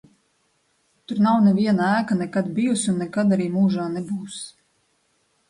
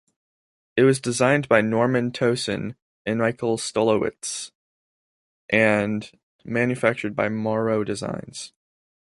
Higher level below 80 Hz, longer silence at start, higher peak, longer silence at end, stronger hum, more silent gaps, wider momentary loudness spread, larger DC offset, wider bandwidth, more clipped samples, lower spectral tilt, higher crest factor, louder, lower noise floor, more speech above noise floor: about the same, -64 dBFS vs -60 dBFS; first, 1.1 s vs 0.75 s; second, -8 dBFS vs -4 dBFS; first, 1 s vs 0.55 s; neither; second, none vs 2.82-3.05 s, 4.55-5.49 s, 6.23-6.39 s; about the same, 13 LU vs 14 LU; neither; about the same, 11.5 kHz vs 11.5 kHz; neither; about the same, -6 dB/octave vs -5 dB/octave; second, 14 dB vs 20 dB; about the same, -21 LUFS vs -23 LUFS; second, -67 dBFS vs under -90 dBFS; second, 46 dB vs over 68 dB